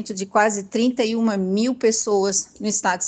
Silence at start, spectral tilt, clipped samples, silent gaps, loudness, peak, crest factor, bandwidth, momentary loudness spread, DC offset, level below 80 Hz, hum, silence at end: 0 s; -3.5 dB/octave; under 0.1%; none; -21 LUFS; -4 dBFS; 18 dB; 9.4 kHz; 3 LU; under 0.1%; -64 dBFS; none; 0 s